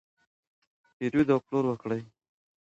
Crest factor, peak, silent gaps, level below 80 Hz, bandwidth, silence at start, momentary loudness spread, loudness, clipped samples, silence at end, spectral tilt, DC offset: 20 dB; -12 dBFS; none; -66 dBFS; 7.8 kHz; 1 s; 10 LU; -28 LUFS; under 0.1%; 0.55 s; -8.5 dB/octave; under 0.1%